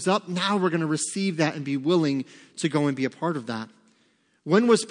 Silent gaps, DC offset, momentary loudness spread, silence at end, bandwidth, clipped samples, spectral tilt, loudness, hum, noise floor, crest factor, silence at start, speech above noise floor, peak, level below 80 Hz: none; under 0.1%; 12 LU; 0 s; 10.5 kHz; under 0.1%; -5 dB/octave; -25 LUFS; none; -65 dBFS; 18 dB; 0 s; 41 dB; -6 dBFS; -78 dBFS